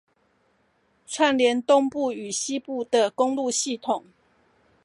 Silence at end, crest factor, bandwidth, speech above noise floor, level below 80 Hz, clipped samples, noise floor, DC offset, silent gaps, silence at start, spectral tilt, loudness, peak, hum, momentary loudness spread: 0.85 s; 20 dB; 11.5 kHz; 43 dB; -74 dBFS; under 0.1%; -66 dBFS; under 0.1%; none; 1.1 s; -2 dB/octave; -24 LUFS; -6 dBFS; none; 9 LU